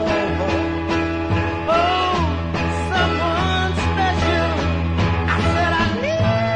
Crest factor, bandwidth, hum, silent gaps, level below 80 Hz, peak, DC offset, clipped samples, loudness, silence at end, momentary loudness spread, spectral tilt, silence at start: 12 dB; 9.6 kHz; none; none; -34 dBFS; -6 dBFS; under 0.1%; under 0.1%; -19 LUFS; 0 s; 3 LU; -6 dB/octave; 0 s